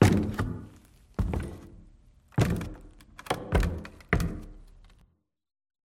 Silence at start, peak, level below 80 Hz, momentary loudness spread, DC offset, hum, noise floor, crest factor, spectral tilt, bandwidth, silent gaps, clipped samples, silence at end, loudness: 0 s; -6 dBFS; -38 dBFS; 22 LU; under 0.1%; none; -66 dBFS; 24 dB; -6.5 dB/octave; 16.5 kHz; none; under 0.1%; 1.3 s; -31 LUFS